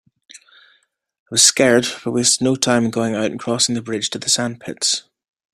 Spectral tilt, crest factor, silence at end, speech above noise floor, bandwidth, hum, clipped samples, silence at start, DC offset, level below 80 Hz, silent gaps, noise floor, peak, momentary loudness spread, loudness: -2.5 dB/octave; 20 dB; 0.55 s; 43 dB; 16 kHz; none; under 0.1%; 0.35 s; under 0.1%; -60 dBFS; 1.19-1.26 s; -61 dBFS; 0 dBFS; 10 LU; -17 LUFS